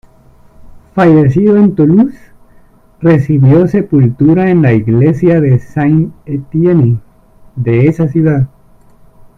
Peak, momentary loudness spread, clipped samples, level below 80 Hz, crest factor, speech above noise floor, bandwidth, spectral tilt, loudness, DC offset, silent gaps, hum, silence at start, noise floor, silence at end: 0 dBFS; 10 LU; under 0.1%; -40 dBFS; 10 dB; 34 dB; 6.2 kHz; -10.5 dB/octave; -10 LUFS; under 0.1%; none; none; 0.6 s; -42 dBFS; 0.9 s